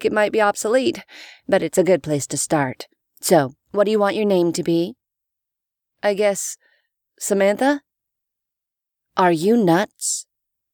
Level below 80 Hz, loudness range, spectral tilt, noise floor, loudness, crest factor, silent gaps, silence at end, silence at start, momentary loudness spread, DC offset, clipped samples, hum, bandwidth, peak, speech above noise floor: -64 dBFS; 3 LU; -4.5 dB/octave; -85 dBFS; -20 LUFS; 18 dB; none; 0.5 s; 0 s; 11 LU; under 0.1%; under 0.1%; none; over 20 kHz; -2 dBFS; 66 dB